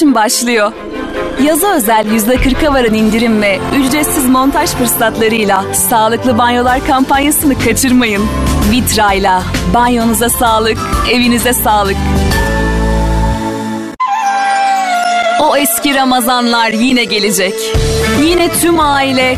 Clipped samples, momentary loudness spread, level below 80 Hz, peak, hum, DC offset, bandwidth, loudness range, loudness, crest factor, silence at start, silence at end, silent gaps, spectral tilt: under 0.1%; 4 LU; -22 dBFS; 0 dBFS; none; 0.5%; 14 kHz; 2 LU; -11 LUFS; 10 dB; 0 s; 0 s; none; -4 dB/octave